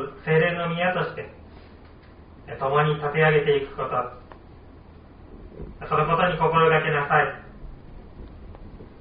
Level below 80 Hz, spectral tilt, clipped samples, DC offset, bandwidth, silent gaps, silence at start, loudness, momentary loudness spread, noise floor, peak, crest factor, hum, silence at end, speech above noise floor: -46 dBFS; -4 dB/octave; under 0.1%; under 0.1%; 5 kHz; none; 0 s; -22 LUFS; 25 LU; -47 dBFS; -6 dBFS; 18 dB; none; 0 s; 25 dB